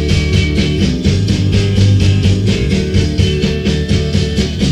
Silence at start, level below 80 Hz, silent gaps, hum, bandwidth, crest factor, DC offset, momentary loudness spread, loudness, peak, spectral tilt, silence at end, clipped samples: 0 s; -20 dBFS; none; none; 10.5 kHz; 12 dB; under 0.1%; 4 LU; -13 LUFS; 0 dBFS; -6 dB/octave; 0 s; under 0.1%